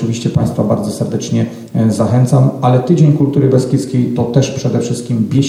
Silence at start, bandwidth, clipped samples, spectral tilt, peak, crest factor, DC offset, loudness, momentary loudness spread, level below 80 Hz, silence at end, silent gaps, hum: 0 s; 12.5 kHz; under 0.1%; -7.5 dB/octave; 0 dBFS; 12 dB; under 0.1%; -13 LUFS; 7 LU; -46 dBFS; 0 s; none; none